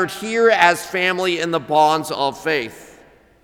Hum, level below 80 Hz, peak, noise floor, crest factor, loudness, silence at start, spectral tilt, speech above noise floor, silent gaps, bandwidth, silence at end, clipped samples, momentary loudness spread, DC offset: none; -58 dBFS; 0 dBFS; -49 dBFS; 18 dB; -17 LUFS; 0 s; -3.5 dB/octave; 31 dB; none; 18.5 kHz; 0.6 s; under 0.1%; 8 LU; under 0.1%